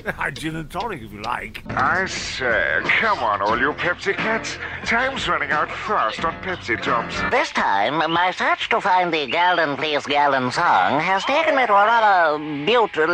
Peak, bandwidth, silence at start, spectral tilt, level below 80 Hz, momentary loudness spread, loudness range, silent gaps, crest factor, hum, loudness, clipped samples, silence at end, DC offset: -6 dBFS; 15 kHz; 0.05 s; -4 dB/octave; -48 dBFS; 11 LU; 4 LU; none; 14 dB; none; -20 LUFS; under 0.1%; 0 s; under 0.1%